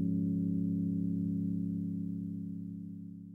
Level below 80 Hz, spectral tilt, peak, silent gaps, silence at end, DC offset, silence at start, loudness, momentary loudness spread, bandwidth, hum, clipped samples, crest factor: -68 dBFS; -12.5 dB/octave; -24 dBFS; none; 0 s; under 0.1%; 0 s; -36 LUFS; 11 LU; 0.7 kHz; none; under 0.1%; 12 dB